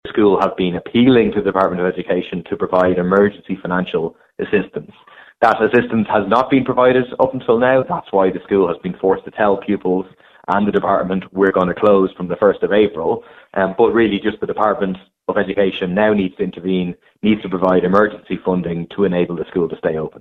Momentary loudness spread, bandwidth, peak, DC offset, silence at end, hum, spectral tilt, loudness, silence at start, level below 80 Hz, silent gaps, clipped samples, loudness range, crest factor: 8 LU; 6 kHz; 0 dBFS; under 0.1%; 0 s; none; -8.5 dB/octave; -17 LUFS; 0.05 s; -48 dBFS; none; under 0.1%; 3 LU; 16 dB